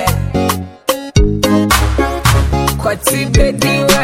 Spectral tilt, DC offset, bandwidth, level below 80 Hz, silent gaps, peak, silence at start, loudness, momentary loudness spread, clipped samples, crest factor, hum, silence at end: -4.5 dB/octave; under 0.1%; 17 kHz; -18 dBFS; none; 0 dBFS; 0 s; -13 LUFS; 5 LU; under 0.1%; 12 dB; none; 0 s